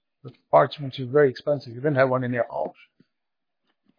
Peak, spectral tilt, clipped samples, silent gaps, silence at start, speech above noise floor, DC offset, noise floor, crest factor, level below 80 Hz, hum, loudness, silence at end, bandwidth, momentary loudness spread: -4 dBFS; -8.5 dB/octave; under 0.1%; none; 0.25 s; 63 dB; under 0.1%; -86 dBFS; 20 dB; -74 dBFS; none; -23 LUFS; 1.3 s; 5.2 kHz; 10 LU